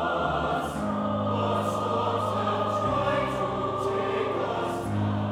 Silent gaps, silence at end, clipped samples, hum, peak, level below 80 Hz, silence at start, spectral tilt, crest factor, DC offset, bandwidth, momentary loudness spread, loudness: none; 0 s; under 0.1%; none; -12 dBFS; -50 dBFS; 0 s; -6.5 dB/octave; 16 dB; under 0.1%; 15.5 kHz; 3 LU; -27 LUFS